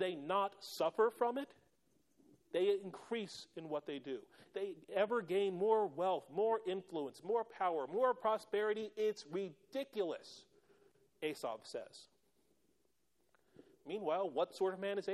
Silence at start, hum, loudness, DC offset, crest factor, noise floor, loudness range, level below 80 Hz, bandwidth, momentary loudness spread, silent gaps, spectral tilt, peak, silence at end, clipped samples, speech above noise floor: 0 s; none; -39 LUFS; under 0.1%; 18 dB; -81 dBFS; 10 LU; -88 dBFS; 13.5 kHz; 13 LU; none; -5 dB/octave; -22 dBFS; 0 s; under 0.1%; 42 dB